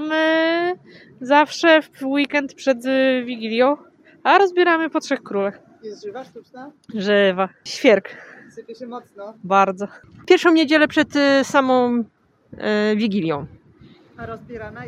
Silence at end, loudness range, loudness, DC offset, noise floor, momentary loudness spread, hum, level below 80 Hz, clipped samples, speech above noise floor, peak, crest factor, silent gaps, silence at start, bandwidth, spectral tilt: 0 s; 4 LU; -18 LUFS; under 0.1%; -49 dBFS; 20 LU; none; -62 dBFS; under 0.1%; 30 dB; 0 dBFS; 20 dB; none; 0 s; 13 kHz; -4.5 dB/octave